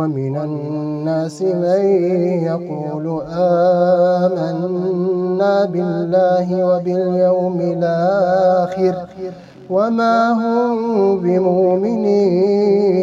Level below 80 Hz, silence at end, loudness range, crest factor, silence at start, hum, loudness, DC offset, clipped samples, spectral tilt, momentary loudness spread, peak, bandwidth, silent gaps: -58 dBFS; 0 s; 2 LU; 12 dB; 0 s; none; -16 LUFS; under 0.1%; under 0.1%; -8.5 dB/octave; 9 LU; -4 dBFS; 7.8 kHz; none